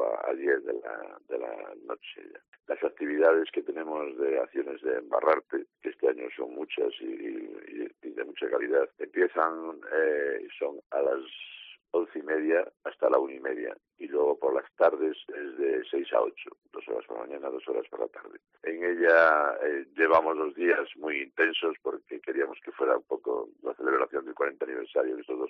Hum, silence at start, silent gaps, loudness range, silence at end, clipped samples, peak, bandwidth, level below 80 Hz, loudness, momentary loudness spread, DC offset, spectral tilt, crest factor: none; 0 s; 2.48-2.52 s, 10.86-10.90 s; 6 LU; 0 s; under 0.1%; -10 dBFS; 5.4 kHz; -78 dBFS; -29 LUFS; 14 LU; under 0.1%; -0.5 dB/octave; 20 dB